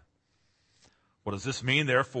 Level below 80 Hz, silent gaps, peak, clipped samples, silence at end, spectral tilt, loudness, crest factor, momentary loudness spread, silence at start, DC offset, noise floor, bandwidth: -66 dBFS; none; -12 dBFS; under 0.1%; 0 s; -4.5 dB/octave; -28 LUFS; 20 dB; 14 LU; 1.25 s; under 0.1%; -72 dBFS; 8.8 kHz